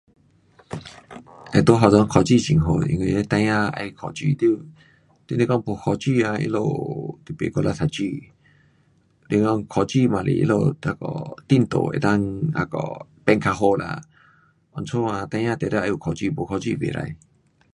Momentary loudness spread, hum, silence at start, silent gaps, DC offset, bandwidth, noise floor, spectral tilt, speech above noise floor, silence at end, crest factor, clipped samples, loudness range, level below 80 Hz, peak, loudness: 15 LU; none; 0.7 s; none; under 0.1%; 11 kHz; -60 dBFS; -7 dB/octave; 39 dB; 0.55 s; 22 dB; under 0.1%; 7 LU; -46 dBFS; 0 dBFS; -22 LUFS